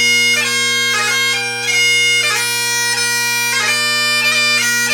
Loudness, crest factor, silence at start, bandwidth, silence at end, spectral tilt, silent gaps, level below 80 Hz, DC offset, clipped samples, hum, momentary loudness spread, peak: -12 LUFS; 12 dB; 0 s; over 20 kHz; 0 s; 0.5 dB/octave; none; -66 dBFS; under 0.1%; under 0.1%; none; 4 LU; -2 dBFS